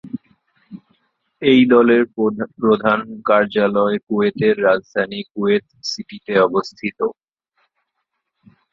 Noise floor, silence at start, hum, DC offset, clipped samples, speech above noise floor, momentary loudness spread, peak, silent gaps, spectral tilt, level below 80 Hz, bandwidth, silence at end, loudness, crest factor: -75 dBFS; 0.05 s; none; under 0.1%; under 0.1%; 58 dB; 13 LU; -2 dBFS; 4.03-4.07 s; -6 dB/octave; -60 dBFS; 7.4 kHz; 1.6 s; -17 LUFS; 18 dB